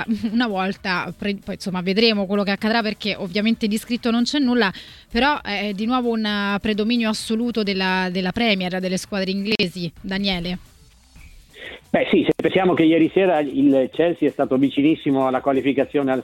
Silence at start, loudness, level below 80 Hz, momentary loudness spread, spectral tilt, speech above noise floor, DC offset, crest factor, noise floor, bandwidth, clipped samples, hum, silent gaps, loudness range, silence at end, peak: 0 s; -20 LUFS; -48 dBFS; 8 LU; -5.5 dB/octave; 29 dB; under 0.1%; 18 dB; -49 dBFS; 16 kHz; under 0.1%; none; none; 5 LU; 0 s; -2 dBFS